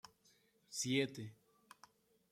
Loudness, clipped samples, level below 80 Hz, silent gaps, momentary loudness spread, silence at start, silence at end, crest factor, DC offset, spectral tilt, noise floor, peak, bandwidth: -40 LUFS; under 0.1%; -82 dBFS; none; 18 LU; 0.05 s; 0.95 s; 24 dB; under 0.1%; -3.5 dB/octave; -74 dBFS; -22 dBFS; 16 kHz